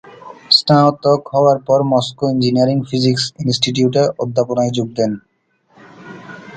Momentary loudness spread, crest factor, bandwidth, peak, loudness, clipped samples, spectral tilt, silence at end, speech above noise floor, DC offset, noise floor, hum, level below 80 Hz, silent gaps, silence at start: 8 LU; 16 dB; 9.2 kHz; 0 dBFS; -15 LUFS; under 0.1%; -5.5 dB/octave; 0 s; 41 dB; under 0.1%; -56 dBFS; none; -56 dBFS; none; 0.05 s